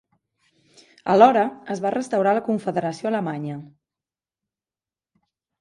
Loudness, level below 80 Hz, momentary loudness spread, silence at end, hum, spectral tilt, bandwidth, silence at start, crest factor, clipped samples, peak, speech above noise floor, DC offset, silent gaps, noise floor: -21 LUFS; -68 dBFS; 16 LU; 1.95 s; none; -6.5 dB/octave; 11.5 kHz; 1.05 s; 22 dB; under 0.1%; -2 dBFS; over 69 dB; under 0.1%; none; under -90 dBFS